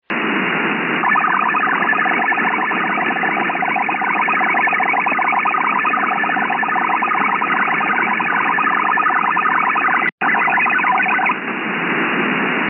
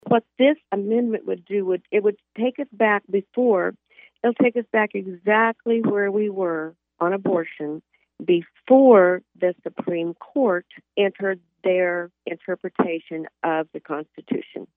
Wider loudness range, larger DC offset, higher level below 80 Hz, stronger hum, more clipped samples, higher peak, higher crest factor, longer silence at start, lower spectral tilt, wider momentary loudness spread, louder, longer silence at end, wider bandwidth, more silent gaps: second, 1 LU vs 5 LU; neither; about the same, -86 dBFS vs -82 dBFS; neither; neither; about the same, -6 dBFS vs -4 dBFS; second, 12 dB vs 18 dB; about the same, 0.1 s vs 0.05 s; second, -8 dB/octave vs -10 dB/octave; second, 3 LU vs 11 LU; first, -16 LUFS vs -22 LUFS; about the same, 0 s vs 0.1 s; about the same, 3.9 kHz vs 3.8 kHz; first, 10.12-10.18 s vs none